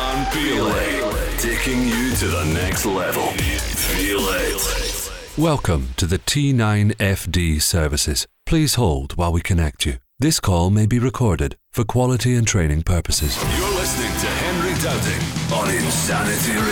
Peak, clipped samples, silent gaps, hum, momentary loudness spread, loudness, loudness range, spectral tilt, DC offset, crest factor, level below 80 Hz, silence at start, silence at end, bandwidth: -8 dBFS; under 0.1%; none; none; 4 LU; -20 LUFS; 1 LU; -4.5 dB/octave; under 0.1%; 12 dB; -30 dBFS; 0 s; 0 s; 19.5 kHz